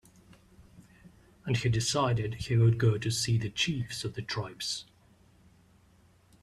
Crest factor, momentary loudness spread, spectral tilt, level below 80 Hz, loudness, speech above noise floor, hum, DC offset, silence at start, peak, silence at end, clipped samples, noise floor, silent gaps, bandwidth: 18 dB; 10 LU; -5 dB/octave; -56 dBFS; -30 LUFS; 33 dB; none; under 0.1%; 0.8 s; -14 dBFS; 1.6 s; under 0.1%; -62 dBFS; none; 13 kHz